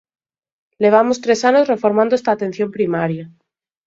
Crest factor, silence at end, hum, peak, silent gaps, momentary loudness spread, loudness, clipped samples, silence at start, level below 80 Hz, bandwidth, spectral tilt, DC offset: 18 dB; 0.6 s; none; 0 dBFS; none; 8 LU; -16 LUFS; under 0.1%; 0.8 s; -64 dBFS; 7.8 kHz; -5.5 dB/octave; under 0.1%